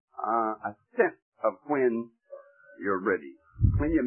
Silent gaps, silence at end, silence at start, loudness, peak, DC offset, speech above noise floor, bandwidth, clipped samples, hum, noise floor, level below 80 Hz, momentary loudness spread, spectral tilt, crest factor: 1.22-1.32 s; 0 s; 0.2 s; -29 LUFS; -10 dBFS; under 0.1%; 22 dB; 3 kHz; under 0.1%; none; -50 dBFS; -40 dBFS; 19 LU; -13 dB/octave; 20 dB